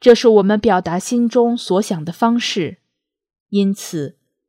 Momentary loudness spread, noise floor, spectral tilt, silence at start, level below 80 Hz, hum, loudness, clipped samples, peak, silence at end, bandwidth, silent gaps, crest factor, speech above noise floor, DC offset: 13 LU; -77 dBFS; -5.5 dB/octave; 0 s; -52 dBFS; none; -16 LUFS; 0.2%; 0 dBFS; 0.4 s; 15.5 kHz; 3.40-3.46 s; 16 dB; 62 dB; under 0.1%